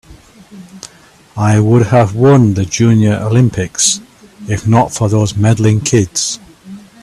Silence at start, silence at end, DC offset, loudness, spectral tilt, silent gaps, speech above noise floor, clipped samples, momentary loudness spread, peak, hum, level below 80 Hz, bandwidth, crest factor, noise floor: 0.1 s; 0.25 s; under 0.1%; -12 LUFS; -5.5 dB/octave; none; 23 dB; under 0.1%; 14 LU; 0 dBFS; none; -42 dBFS; 12.5 kHz; 12 dB; -34 dBFS